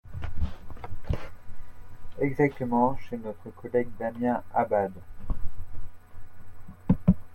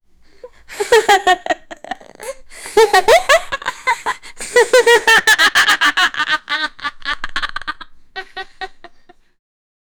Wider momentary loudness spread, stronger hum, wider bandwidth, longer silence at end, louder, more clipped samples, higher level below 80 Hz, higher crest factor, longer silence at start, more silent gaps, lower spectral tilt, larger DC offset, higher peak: about the same, 21 LU vs 21 LU; neither; second, 4.5 kHz vs over 20 kHz; second, 0 s vs 1.1 s; second, -29 LUFS vs -13 LUFS; neither; about the same, -40 dBFS vs -42 dBFS; about the same, 20 dB vs 16 dB; second, 0.05 s vs 0.45 s; neither; first, -9.5 dB/octave vs -0.5 dB/octave; neither; second, -6 dBFS vs 0 dBFS